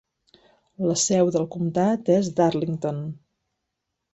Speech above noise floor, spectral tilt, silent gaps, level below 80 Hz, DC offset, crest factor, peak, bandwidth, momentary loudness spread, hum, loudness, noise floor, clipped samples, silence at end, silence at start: 58 dB; -5.5 dB/octave; none; -62 dBFS; under 0.1%; 18 dB; -6 dBFS; 8.2 kHz; 9 LU; none; -23 LUFS; -81 dBFS; under 0.1%; 0.95 s; 0.8 s